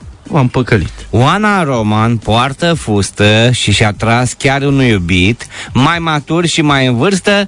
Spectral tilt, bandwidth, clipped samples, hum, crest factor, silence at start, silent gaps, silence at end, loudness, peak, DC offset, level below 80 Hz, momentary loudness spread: -5 dB/octave; 11 kHz; under 0.1%; none; 12 dB; 0 s; none; 0 s; -11 LUFS; 0 dBFS; under 0.1%; -34 dBFS; 4 LU